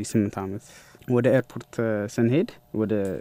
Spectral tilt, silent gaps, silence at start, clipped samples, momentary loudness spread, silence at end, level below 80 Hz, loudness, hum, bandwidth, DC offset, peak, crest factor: -7 dB/octave; none; 0 s; under 0.1%; 13 LU; 0 s; -62 dBFS; -25 LUFS; none; 16 kHz; under 0.1%; -8 dBFS; 18 dB